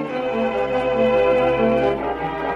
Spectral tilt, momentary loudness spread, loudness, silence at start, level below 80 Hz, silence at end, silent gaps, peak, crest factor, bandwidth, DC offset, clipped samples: -7 dB/octave; 7 LU; -19 LUFS; 0 s; -42 dBFS; 0 s; none; -6 dBFS; 12 dB; 7.4 kHz; under 0.1%; under 0.1%